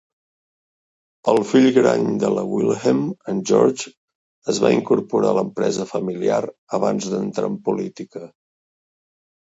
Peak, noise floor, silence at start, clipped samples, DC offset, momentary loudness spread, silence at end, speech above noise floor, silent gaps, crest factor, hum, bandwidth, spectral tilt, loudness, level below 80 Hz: -2 dBFS; under -90 dBFS; 1.25 s; under 0.1%; under 0.1%; 11 LU; 1.25 s; over 71 dB; 3.97-4.08 s, 4.15-4.42 s, 6.58-6.67 s; 18 dB; none; 8 kHz; -5.5 dB/octave; -20 LUFS; -64 dBFS